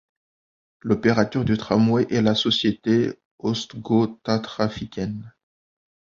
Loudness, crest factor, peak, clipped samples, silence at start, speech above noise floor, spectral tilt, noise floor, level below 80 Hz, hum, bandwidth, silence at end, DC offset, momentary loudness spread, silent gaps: -22 LUFS; 20 dB; -4 dBFS; under 0.1%; 0.85 s; over 68 dB; -6 dB/octave; under -90 dBFS; -52 dBFS; none; 7.4 kHz; 0.85 s; under 0.1%; 10 LU; 3.25-3.38 s